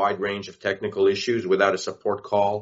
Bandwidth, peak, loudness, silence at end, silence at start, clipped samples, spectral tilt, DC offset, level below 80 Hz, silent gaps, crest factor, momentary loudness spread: 8 kHz; -4 dBFS; -24 LUFS; 0 s; 0 s; under 0.1%; -3 dB/octave; under 0.1%; -66 dBFS; none; 20 dB; 8 LU